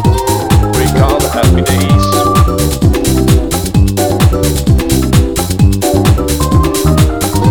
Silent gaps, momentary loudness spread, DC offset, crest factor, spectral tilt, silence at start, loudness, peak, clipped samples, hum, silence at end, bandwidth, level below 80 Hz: none; 2 LU; under 0.1%; 10 dB; -5.5 dB/octave; 0 s; -10 LUFS; 0 dBFS; 0.2%; none; 0 s; over 20 kHz; -16 dBFS